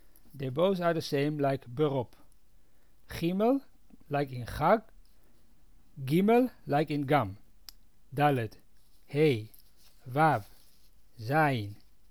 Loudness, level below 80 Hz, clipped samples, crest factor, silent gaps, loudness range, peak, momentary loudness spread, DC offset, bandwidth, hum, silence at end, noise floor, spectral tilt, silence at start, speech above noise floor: -29 LUFS; -60 dBFS; under 0.1%; 18 dB; none; 3 LU; -12 dBFS; 14 LU; 0.2%; over 20 kHz; none; 0.35 s; -64 dBFS; -7 dB/octave; 0.35 s; 36 dB